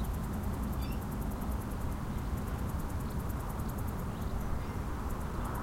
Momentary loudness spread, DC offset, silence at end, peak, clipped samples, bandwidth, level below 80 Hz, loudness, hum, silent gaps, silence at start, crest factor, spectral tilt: 2 LU; under 0.1%; 0 s; -22 dBFS; under 0.1%; 16.5 kHz; -40 dBFS; -38 LUFS; none; none; 0 s; 12 dB; -6.5 dB/octave